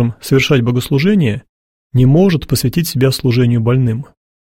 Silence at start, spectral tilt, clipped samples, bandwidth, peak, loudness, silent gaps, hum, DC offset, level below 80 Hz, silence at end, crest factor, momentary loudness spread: 0 s; -6.5 dB/octave; under 0.1%; 16.5 kHz; 0 dBFS; -13 LUFS; 1.49-1.90 s; none; under 0.1%; -40 dBFS; 0.5 s; 12 dB; 7 LU